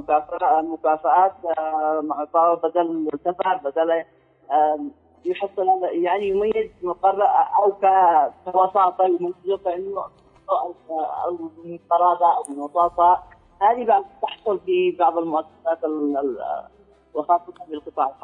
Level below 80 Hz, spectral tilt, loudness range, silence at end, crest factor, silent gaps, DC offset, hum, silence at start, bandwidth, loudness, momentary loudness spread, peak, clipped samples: -62 dBFS; -6 dB/octave; 4 LU; 0.1 s; 14 dB; none; under 0.1%; none; 0 s; 11 kHz; -21 LUFS; 11 LU; -6 dBFS; under 0.1%